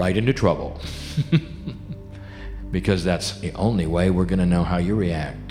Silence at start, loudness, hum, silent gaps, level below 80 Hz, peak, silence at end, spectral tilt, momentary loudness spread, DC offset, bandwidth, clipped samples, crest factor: 0 s; -22 LUFS; none; none; -36 dBFS; -4 dBFS; 0 s; -6.5 dB/octave; 16 LU; under 0.1%; 13 kHz; under 0.1%; 18 dB